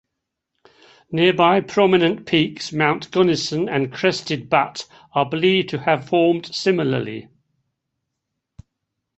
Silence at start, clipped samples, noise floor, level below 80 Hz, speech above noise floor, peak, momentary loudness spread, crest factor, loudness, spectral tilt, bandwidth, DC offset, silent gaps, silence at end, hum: 1.1 s; under 0.1%; -80 dBFS; -60 dBFS; 61 dB; -2 dBFS; 9 LU; 20 dB; -19 LUFS; -5.5 dB/octave; 8.2 kHz; under 0.1%; none; 1.95 s; none